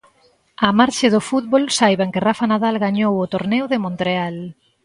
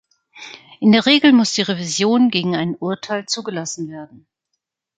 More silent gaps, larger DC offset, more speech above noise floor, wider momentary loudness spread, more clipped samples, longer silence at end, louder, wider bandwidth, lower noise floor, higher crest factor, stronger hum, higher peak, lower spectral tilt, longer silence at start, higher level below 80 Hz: neither; neither; second, 40 dB vs 60 dB; second, 7 LU vs 24 LU; neither; second, 0.35 s vs 0.95 s; about the same, -18 LUFS vs -17 LUFS; first, 11.5 kHz vs 9.4 kHz; second, -57 dBFS vs -77 dBFS; about the same, 18 dB vs 18 dB; neither; about the same, 0 dBFS vs -2 dBFS; about the same, -5 dB/octave vs -4 dB/octave; first, 0.6 s vs 0.35 s; first, -58 dBFS vs -64 dBFS